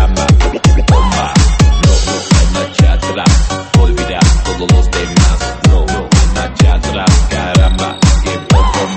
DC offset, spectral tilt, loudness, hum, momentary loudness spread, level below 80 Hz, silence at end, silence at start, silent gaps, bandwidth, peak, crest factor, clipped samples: under 0.1%; -5 dB/octave; -11 LUFS; none; 3 LU; -12 dBFS; 0 s; 0 s; none; 8.8 kHz; 0 dBFS; 10 dB; 0.2%